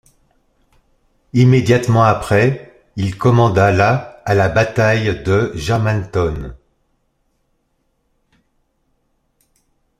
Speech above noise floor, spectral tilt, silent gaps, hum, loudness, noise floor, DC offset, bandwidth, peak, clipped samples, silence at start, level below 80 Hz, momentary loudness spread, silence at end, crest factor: 52 dB; -7 dB/octave; none; none; -15 LUFS; -66 dBFS; under 0.1%; 13.5 kHz; 0 dBFS; under 0.1%; 1.35 s; -40 dBFS; 10 LU; 3.45 s; 16 dB